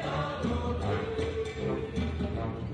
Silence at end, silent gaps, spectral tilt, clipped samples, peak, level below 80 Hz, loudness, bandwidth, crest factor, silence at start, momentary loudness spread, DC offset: 0 s; none; -7 dB/octave; under 0.1%; -18 dBFS; -44 dBFS; -33 LUFS; 9.8 kHz; 14 dB; 0 s; 2 LU; under 0.1%